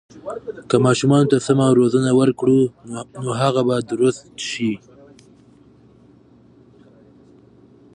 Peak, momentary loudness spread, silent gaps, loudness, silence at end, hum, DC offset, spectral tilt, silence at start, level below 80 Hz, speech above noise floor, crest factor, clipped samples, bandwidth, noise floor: -2 dBFS; 17 LU; none; -18 LUFS; 3.15 s; none; under 0.1%; -6.5 dB/octave; 0.15 s; -58 dBFS; 32 dB; 18 dB; under 0.1%; 10.5 kHz; -50 dBFS